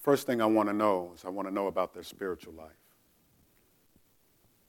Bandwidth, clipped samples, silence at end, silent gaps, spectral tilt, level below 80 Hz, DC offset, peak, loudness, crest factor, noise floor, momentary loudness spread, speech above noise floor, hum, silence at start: 17.5 kHz; under 0.1%; 2 s; none; -5.5 dB/octave; -72 dBFS; under 0.1%; -12 dBFS; -31 LUFS; 20 dB; -67 dBFS; 14 LU; 37 dB; none; 0 s